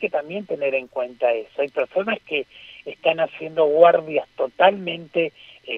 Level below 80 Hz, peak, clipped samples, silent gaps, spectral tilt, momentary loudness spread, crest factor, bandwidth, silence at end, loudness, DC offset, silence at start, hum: -68 dBFS; 0 dBFS; under 0.1%; none; -6.5 dB/octave; 14 LU; 22 dB; 5.2 kHz; 0 s; -21 LUFS; under 0.1%; 0 s; none